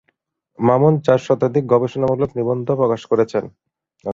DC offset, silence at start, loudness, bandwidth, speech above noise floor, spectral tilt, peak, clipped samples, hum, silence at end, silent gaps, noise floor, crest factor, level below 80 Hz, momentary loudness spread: under 0.1%; 0.6 s; -18 LUFS; 7.6 kHz; 51 dB; -8.5 dB/octave; 0 dBFS; under 0.1%; none; 0 s; none; -68 dBFS; 18 dB; -54 dBFS; 7 LU